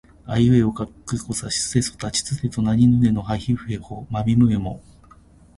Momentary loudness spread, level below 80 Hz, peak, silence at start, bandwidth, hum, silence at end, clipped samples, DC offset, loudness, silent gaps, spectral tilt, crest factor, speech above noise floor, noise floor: 13 LU; -42 dBFS; -4 dBFS; 0.25 s; 11.5 kHz; none; 0.8 s; under 0.1%; under 0.1%; -21 LUFS; none; -5.5 dB/octave; 16 dB; 29 dB; -49 dBFS